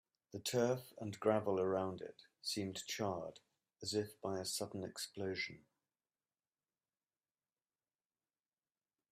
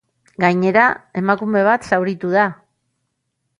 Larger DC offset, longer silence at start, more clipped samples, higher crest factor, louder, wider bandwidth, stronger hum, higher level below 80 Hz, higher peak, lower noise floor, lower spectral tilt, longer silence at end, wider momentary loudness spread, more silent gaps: neither; about the same, 0.35 s vs 0.4 s; neither; about the same, 22 dB vs 18 dB; second, -41 LUFS vs -17 LUFS; first, 15.5 kHz vs 11 kHz; neither; second, -82 dBFS vs -60 dBFS; second, -20 dBFS vs -2 dBFS; first, under -90 dBFS vs -73 dBFS; second, -4 dB/octave vs -7 dB/octave; first, 3.55 s vs 1.05 s; first, 11 LU vs 5 LU; neither